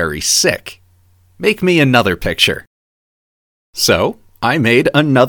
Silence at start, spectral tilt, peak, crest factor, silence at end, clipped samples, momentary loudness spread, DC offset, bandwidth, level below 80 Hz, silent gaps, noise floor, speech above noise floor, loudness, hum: 0 s; -3.5 dB/octave; 0 dBFS; 16 dB; 0 s; under 0.1%; 11 LU; under 0.1%; 19.5 kHz; -40 dBFS; 2.67-3.73 s; -51 dBFS; 38 dB; -13 LUFS; none